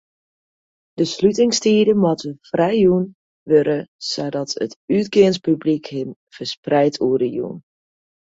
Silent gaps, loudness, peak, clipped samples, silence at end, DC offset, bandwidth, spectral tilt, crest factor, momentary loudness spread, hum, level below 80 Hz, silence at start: 3.15-3.46 s, 3.88-3.99 s, 4.76-4.88 s, 6.16-6.27 s, 6.57-6.63 s; -19 LUFS; -2 dBFS; under 0.1%; 0.75 s; under 0.1%; 8 kHz; -5.5 dB/octave; 18 dB; 13 LU; none; -60 dBFS; 0.95 s